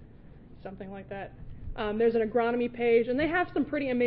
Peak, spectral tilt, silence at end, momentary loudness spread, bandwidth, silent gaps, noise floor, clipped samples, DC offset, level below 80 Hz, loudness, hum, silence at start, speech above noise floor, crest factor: -12 dBFS; -10 dB/octave; 0 s; 19 LU; 4.9 kHz; none; -50 dBFS; under 0.1%; under 0.1%; -48 dBFS; -27 LUFS; none; 0 s; 22 dB; 16 dB